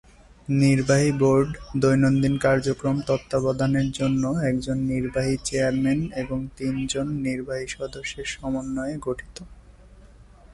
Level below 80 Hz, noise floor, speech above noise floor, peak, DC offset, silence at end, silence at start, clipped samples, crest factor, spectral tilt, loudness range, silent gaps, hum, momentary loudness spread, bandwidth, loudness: -44 dBFS; -49 dBFS; 26 dB; -8 dBFS; under 0.1%; 0 s; 0.5 s; under 0.1%; 16 dB; -6 dB/octave; 8 LU; none; none; 11 LU; 11.5 kHz; -24 LUFS